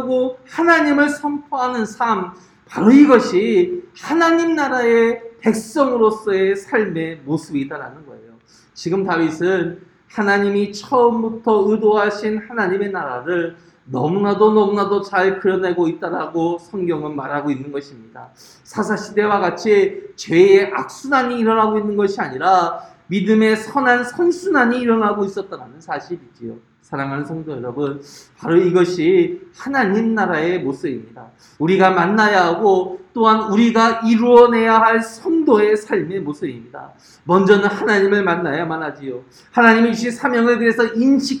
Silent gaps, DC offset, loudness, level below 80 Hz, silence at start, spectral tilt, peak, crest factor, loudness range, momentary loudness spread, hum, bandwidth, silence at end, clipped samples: none; under 0.1%; -16 LUFS; -60 dBFS; 0 s; -6 dB/octave; 0 dBFS; 16 dB; 8 LU; 14 LU; none; 11.5 kHz; 0 s; under 0.1%